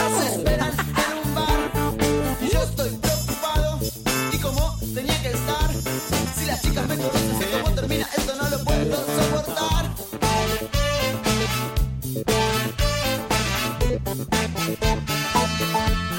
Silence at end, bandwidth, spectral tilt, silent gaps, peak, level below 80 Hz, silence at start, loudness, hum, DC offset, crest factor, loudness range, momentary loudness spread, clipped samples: 0 s; 17 kHz; -4 dB/octave; none; -8 dBFS; -30 dBFS; 0 s; -23 LUFS; none; under 0.1%; 16 dB; 1 LU; 3 LU; under 0.1%